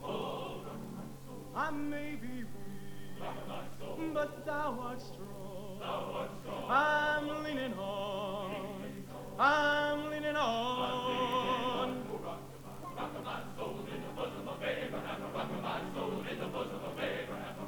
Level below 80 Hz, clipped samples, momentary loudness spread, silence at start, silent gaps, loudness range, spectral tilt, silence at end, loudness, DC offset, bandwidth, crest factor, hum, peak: -60 dBFS; under 0.1%; 15 LU; 0 s; none; 8 LU; -5 dB/octave; 0 s; -37 LUFS; 0.2%; 19.5 kHz; 22 dB; none; -16 dBFS